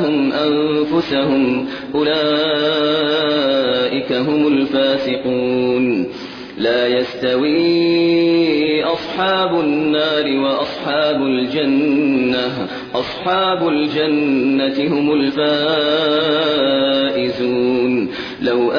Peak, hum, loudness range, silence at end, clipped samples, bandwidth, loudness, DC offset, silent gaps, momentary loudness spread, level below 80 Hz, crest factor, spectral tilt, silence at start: -4 dBFS; none; 2 LU; 0 s; under 0.1%; 5.4 kHz; -16 LUFS; under 0.1%; none; 5 LU; -54 dBFS; 12 dB; -6.5 dB/octave; 0 s